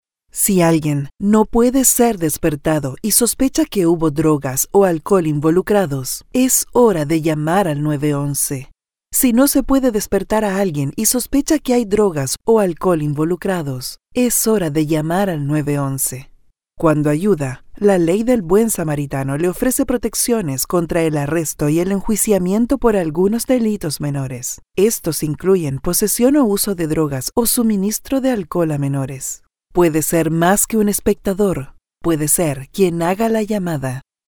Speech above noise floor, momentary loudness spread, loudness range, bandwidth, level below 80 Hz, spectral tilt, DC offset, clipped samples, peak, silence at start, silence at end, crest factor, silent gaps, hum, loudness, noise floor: 31 dB; 7 LU; 3 LU; over 20 kHz; -38 dBFS; -5 dB/octave; under 0.1%; under 0.1%; 0 dBFS; 0.35 s; 0.25 s; 16 dB; none; none; -17 LUFS; -47 dBFS